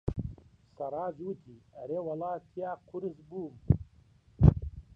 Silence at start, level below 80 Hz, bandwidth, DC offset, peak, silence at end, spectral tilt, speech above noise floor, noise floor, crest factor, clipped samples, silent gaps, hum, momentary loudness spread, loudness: 0.05 s; -40 dBFS; 3.6 kHz; under 0.1%; -6 dBFS; 0.15 s; -11.5 dB/octave; 26 dB; -62 dBFS; 26 dB; under 0.1%; none; none; 18 LU; -33 LUFS